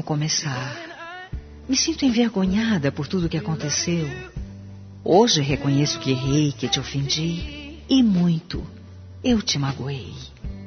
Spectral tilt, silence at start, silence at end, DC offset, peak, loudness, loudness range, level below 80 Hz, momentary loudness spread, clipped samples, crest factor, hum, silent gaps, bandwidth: -5 dB/octave; 0 s; 0 s; under 0.1%; -2 dBFS; -22 LUFS; 2 LU; -42 dBFS; 18 LU; under 0.1%; 20 dB; none; none; 6.6 kHz